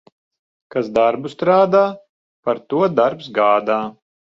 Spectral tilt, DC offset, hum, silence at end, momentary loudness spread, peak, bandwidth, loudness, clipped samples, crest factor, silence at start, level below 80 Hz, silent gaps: -7 dB/octave; under 0.1%; none; 0.4 s; 10 LU; -2 dBFS; 7.6 kHz; -18 LUFS; under 0.1%; 16 dB; 0.75 s; -60 dBFS; 2.09-2.43 s